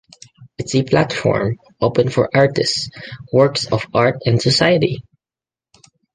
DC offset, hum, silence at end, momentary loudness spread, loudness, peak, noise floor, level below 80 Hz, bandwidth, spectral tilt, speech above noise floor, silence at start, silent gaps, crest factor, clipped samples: under 0.1%; none; 1.15 s; 9 LU; -17 LUFS; 0 dBFS; under -90 dBFS; -48 dBFS; 9.8 kHz; -5.5 dB/octave; over 74 dB; 0.4 s; none; 18 dB; under 0.1%